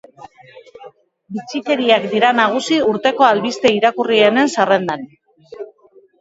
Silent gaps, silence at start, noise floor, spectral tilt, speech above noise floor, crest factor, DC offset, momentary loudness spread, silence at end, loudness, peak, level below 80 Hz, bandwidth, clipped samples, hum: none; 0.2 s; -50 dBFS; -4 dB/octave; 35 dB; 16 dB; under 0.1%; 17 LU; 0.55 s; -15 LUFS; 0 dBFS; -62 dBFS; 8 kHz; under 0.1%; none